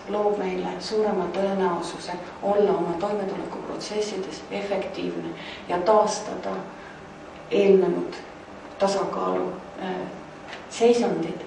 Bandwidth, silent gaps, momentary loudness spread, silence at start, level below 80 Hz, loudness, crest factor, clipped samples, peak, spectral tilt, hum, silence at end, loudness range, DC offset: 10.5 kHz; none; 19 LU; 0 s; -60 dBFS; -25 LUFS; 18 dB; under 0.1%; -6 dBFS; -5.5 dB/octave; none; 0 s; 3 LU; under 0.1%